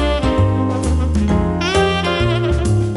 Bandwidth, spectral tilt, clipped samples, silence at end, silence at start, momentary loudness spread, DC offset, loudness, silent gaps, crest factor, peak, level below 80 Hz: 11.5 kHz; -6.5 dB/octave; under 0.1%; 0 s; 0 s; 2 LU; under 0.1%; -17 LUFS; none; 12 dB; -2 dBFS; -22 dBFS